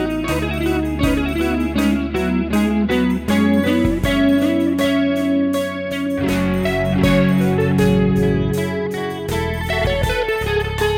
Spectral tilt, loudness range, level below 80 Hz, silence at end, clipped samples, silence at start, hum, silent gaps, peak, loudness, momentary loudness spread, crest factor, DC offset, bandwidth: -6.5 dB/octave; 2 LU; -30 dBFS; 0 s; under 0.1%; 0 s; none; none; -4 dBFS; -18 LUFS; 6 LU; 14 dB; under 0.1%; 17 kHz